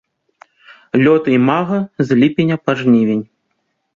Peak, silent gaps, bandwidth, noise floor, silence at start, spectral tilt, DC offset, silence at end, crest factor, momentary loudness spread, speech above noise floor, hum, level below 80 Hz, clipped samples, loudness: -2 dBFS; none; 7.2 kHz; -69 dBFS; 0.95 s; -8 dB/octave; under 0.1%; 0.7 s; 14 dB; 7 LU; 55 dB; none; -56 dBFS; under 0.1%; -14 LUFS